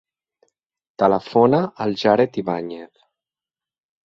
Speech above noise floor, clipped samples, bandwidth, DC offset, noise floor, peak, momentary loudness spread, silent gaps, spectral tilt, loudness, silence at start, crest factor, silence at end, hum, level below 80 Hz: over 71 dB; under 0.1%; 7.2 kHz; under 0.1%; under -90 dBFS; -2 dBFS; 11 LU; none; -7.5 dB/octave; -19 LUFS; 1 s; 20 dB; 1.2 s; none; -62 dBFS